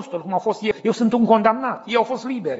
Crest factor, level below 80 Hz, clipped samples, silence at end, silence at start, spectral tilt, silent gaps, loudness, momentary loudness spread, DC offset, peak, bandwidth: 18 dB; -64 dBFS; under 0.1%; 0 s; 0 s; -4.5 dB/octave; none; -20 LUFS; 8 LU; under 0.1%; -2 dBFS; 8 kHz